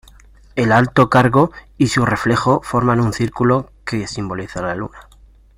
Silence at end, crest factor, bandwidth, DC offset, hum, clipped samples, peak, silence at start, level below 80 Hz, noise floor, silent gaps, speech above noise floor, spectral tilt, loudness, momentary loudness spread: 0.55 s; 16 dB; 15.5 kHz; under 0.1%; none; under 0.1%; 0 dBFS; 0.55 s; -42 dBFS; -45 dBFS; none; 29 dB; -6.5 dB/octave; -17 LUFS; 12 LU